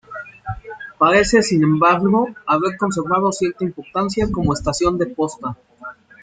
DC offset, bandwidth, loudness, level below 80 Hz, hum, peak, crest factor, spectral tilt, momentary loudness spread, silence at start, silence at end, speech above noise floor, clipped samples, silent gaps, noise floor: under 0.1%; 9.6 kHz; -18 LUFS; -40 dBFS; none; -2 dBFS; 18 dB; -5.5 dB/octave; 18 LU; 0.1 s; 0.3 s; 21 dB; under 0.1%; none; -38 dBFS